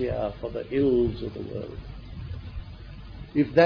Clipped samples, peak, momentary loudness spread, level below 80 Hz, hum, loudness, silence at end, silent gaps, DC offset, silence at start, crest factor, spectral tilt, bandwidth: under 0.1%; -6 dBFS; 19 LU; -42 dBFS; none; -28 LUFS; 0 s; none; under 0.1%; 0 s; 22 dB; -9 dB/octave; 5.4 kHz